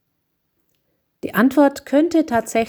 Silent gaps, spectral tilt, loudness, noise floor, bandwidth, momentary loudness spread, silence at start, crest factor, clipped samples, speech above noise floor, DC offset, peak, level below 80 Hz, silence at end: none; -5.5 dB/octave; -17 LUFS; -72 dBFS; over 20 kHz; 8 LU; 1.25 s; 16 dB; under 0.1%; 55 dB; under 0.1%; -4 dBFS; -58 dBFS; 0 s